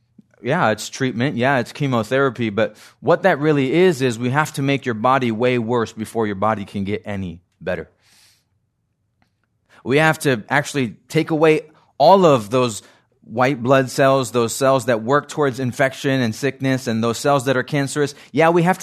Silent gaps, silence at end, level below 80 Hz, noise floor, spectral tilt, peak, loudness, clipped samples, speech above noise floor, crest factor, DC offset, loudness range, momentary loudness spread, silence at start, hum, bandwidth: none; 0 s; -62 dBFS; -69 dBFS; -5.5 dB/octave; 0 dBFS; -18 LUFS; under 0.1%; 51 dB; 18 dB; under 0.1%; 8 LU; 10 LU; 0.45 s; none; 14 kHz